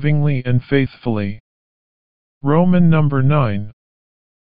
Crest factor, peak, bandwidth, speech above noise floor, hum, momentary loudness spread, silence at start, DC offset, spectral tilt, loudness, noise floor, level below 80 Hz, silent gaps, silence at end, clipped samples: 16 dB; -2 dBFS; 4.9 kHz; over 75 dB; none; 14 LU; 0 s; 5%; -8 dB/octave; -17 LUFS; under -90 dBFS; -44 dBFS; 1.40-2.41 s; 0.85 s; under 0.1%